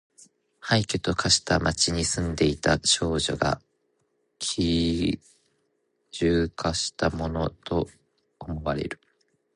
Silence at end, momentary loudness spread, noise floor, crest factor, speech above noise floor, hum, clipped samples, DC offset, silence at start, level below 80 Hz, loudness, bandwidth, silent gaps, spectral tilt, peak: 0.6 s; 14 LU; -73 dBFS; 20 dB; 48 dB; none; under 0.1%; under 0.1%; 0.65 s; -42 dBFS; -25 LUFS; 11.5 kHz; none; -4 dB/octave; -6 dBFS